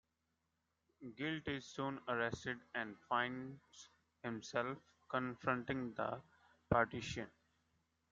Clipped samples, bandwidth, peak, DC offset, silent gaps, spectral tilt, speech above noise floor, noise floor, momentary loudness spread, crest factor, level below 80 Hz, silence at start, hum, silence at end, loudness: under 0.1%; 7.8 kHz; -18 dBFS; under 0.1%; none; -5.5 dB/octave; 44 dB; -86 dBFS; 16 LU; 24 dB; -68 dBFS; 1 s; none; 0.85 s; -42 LUFS